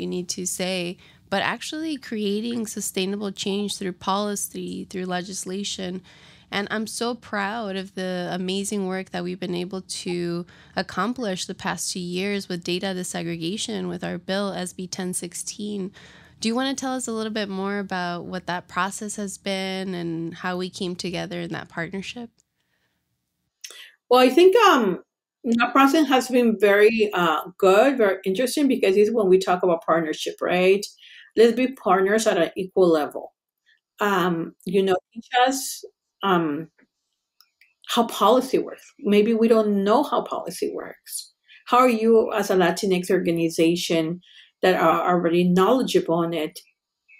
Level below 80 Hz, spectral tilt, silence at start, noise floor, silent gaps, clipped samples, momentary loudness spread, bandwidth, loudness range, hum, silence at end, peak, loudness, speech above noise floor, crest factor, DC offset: -64 dBFS; -4.5 dB/octave; 0 s; -79 dBFS; none; under 0.1%; 13 LU; 16 kHz; 9 LU; none; 0.6 s; -6 dBFS; -23 LUFS; 57 dB; 18 dB; under 0.1%